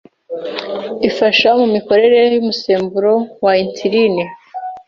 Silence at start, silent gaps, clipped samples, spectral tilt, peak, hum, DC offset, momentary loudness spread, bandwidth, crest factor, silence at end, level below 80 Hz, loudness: 0.3 s; none; under 0.1%; -5.5 dB/octave; 0 dBFS; none; under 0.1%; 14 LU; 7 kHz; 14 dB; 0.1 s; -58 dBFS; -14 LUFS